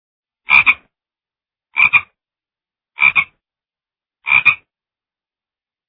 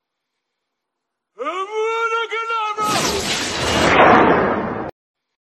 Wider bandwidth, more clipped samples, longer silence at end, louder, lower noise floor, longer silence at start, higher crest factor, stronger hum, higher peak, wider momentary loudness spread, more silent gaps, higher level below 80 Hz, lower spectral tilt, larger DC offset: second, 5.2 kHz vs 13 kHz; neither; first, 1.35 s vs 0.55 s; first, -12 LUFS vs -17 LUFS; first, under -90 dBFS vs -79 dBFS; second, 0.5 s vs 1.4 s; about the same, 20 dB vs 20 dB; neither; about the same, 0 dBFS vs 0 dBFS; about the same, 14 LU vs 15 LU; neither; second, -56 dBFS vs -44 dBFS; about the same, -3.5 dB/octave vs -3.5 dB/octave; neither